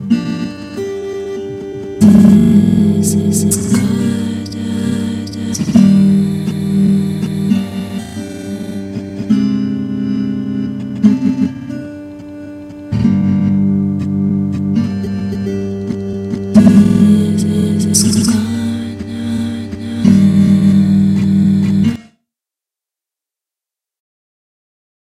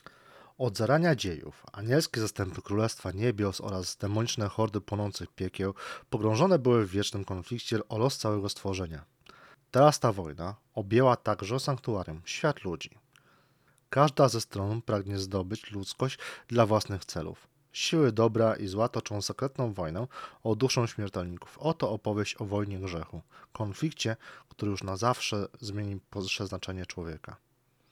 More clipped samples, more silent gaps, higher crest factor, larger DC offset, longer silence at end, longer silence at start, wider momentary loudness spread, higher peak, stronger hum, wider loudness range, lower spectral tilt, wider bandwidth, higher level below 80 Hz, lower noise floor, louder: first, 0.2% vs under 0.1%; neither; second, 14 dB vs 24 dB; neither; first, 3 s vs 0.55 s; second, 0 s vs 0.35 s; about the same, 15 LU vs 14 LU; first, 0 dBFS vs -8 dBFS; neither; about the same, 6 LU vs 5 LU; about the same, -6.5 dB/octave vs -5.5 dB/octave; second, 14 kHz vs 16 kHz; first, -42 dBFS vs -60 dBFS; first, -86 dBFS vs -67 dBFS; first, -13 LUFS vs -30 LUFS